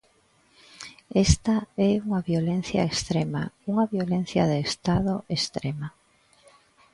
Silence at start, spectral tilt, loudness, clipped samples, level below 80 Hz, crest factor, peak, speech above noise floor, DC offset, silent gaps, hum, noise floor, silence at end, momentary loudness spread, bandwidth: 0.8 s; -5.5 dB/octave; -25 LUFS; under 0.1%; -40 dBFS; 22 dB; -4 dBFS; 38 dB; under 0.1%; none; none; -63 dBFS; 1.05 s; 9 LU; 11.5 kHz